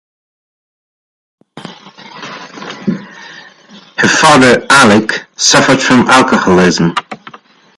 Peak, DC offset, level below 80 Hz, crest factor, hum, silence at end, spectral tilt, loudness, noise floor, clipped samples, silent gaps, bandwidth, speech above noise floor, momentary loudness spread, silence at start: 0 dBFS; under 0.1%; -46 dBFS; 12 dB; none; 0.6 s; -3.5 dB/octave; -8 LUFS; -39 dBFS; 0.1%; none; 16 kHz; 31 dB; 22 LU; 1.55 s